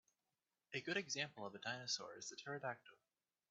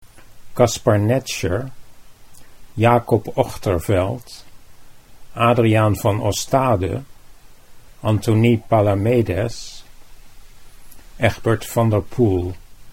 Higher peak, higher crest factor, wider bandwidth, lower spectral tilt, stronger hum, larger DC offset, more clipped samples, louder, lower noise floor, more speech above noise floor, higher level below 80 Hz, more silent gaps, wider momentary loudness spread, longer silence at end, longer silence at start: second, -26 dBFS vs 0 dBFS; first, 24 dB vs 18 dB; second, 8 kHz vs 16.5 kHz; second, -1.5 dB/octave vs -6.5 dB/octave; neither; neither; neither; second, -46 LUFS vs -19 LUFS; first, under -90 dBFS vs -41 dBFS; first, over 42 dB vs 24 dB; second, -90 dBFS vs -42 dBFS; neither; second, 8 LU vs 16 LU; first, 0.55 s vs 0 s; first, 0.7 s vs 0.05 s